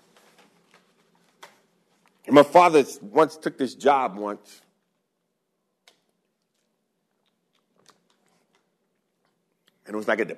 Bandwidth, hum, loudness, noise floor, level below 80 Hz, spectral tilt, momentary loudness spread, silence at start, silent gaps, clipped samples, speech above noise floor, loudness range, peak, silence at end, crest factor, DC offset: 13.5 kHz; none; -21 LUFS; -77 dBFS; -80 dBFS; -5 dB/octave; 18 LU; 2.3 s; none; under 0.1%; 56 dB; 15 LU; -2 dBFS; 0.05 s; 24 dB; under 0.1%